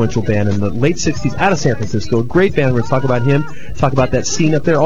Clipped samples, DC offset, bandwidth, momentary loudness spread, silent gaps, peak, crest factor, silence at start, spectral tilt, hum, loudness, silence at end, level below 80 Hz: under 0.1%; 10%; 7.8 kHz; 4 LU; none; 0 dBFS; 14 dB; 0 s; -6 dB/octave; none; -15 LUFS; 0 s; -34 dBFS